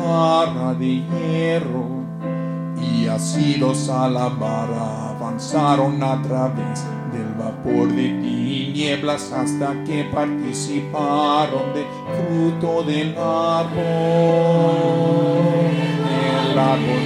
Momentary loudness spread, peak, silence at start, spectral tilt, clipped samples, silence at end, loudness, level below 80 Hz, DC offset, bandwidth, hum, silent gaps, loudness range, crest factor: 9 LU; -4 dBFS; 0 s; -6.5 dB/octave; under 0.1%; 0 s; -20 LUFS; -56 dBFS; under 0.1%; 12 kHz; none; none; 4 LU; 16 dB